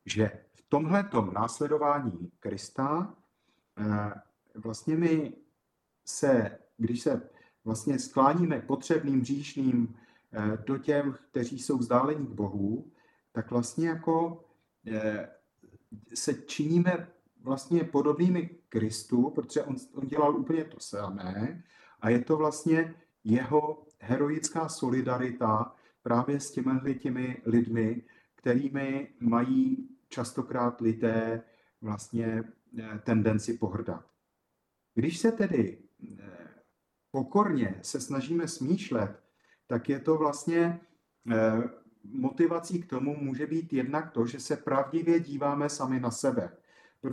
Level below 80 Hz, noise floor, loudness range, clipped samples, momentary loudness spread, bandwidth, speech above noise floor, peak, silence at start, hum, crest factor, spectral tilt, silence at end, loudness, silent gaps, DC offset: -70 dBFS; -80 dBFS; 4 LU; under 0.1%; 12 LU; 12.5 kHz; 51 dB; -10 dBFS; 0.05 s; none; 20 dB; -6.5 dB/octave; 0 s; -30 LUFS; none; under 0.1%